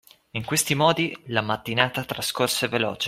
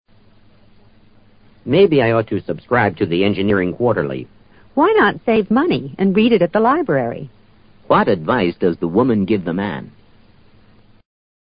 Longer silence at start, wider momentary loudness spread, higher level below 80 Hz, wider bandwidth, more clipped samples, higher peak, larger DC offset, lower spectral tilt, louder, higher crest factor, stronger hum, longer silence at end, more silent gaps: second, 0.35 s vs 1.65 s; second, 7 LU vs 11 LU; second, -60 dBFS vs -48 dBFS; first, 16 kHz vs 5.2 kHz; neither; about the same, -2 dBFS vs -2 dBFS; neither; second, -3.5 dB/octave vs -12 dB/octave; second, -24 LUFS vs -16 LUFS; first, 22 dB vs 16 dB; neither; second, 0 s vs 1.5 s; neither